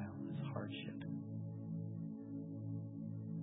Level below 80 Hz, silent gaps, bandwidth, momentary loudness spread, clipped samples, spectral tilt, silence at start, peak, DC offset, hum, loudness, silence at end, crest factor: -74 dBFS; none; 3.8 kHz; 3 LU; under 0.1%; -8.5 dB/octave; 0 s; -28 dBFS; under 0.1%; none; -46 LUFS; 0 s; 16 dB